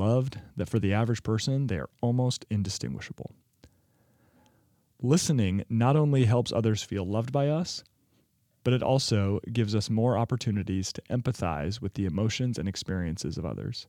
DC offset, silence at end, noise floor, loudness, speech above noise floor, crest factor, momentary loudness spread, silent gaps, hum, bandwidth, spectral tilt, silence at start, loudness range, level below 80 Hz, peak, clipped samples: under 0.1%; 0.05 s; -69 dBFS; -28 LUFS; 42 dB; 18 dB; 10 LU; none; none; 14 kHz; -6 dB/octave; 0 s; 5 LU; -56 dBFS; -10 dBFS; under 0.1%